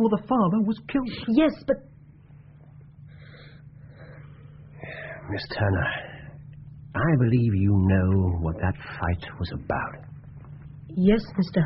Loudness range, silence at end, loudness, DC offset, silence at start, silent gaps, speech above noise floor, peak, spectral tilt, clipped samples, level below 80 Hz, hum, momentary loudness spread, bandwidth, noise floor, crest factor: 13 LU; 0 s; -25 LUFS; under 0.1%; 0 s; none; 26 dB; -8 dBFS; -7 dB/octave; under 0.1%; -44 dBFS; none; 24 LU; 5.8 kHz; -49 dBFS; 18 dB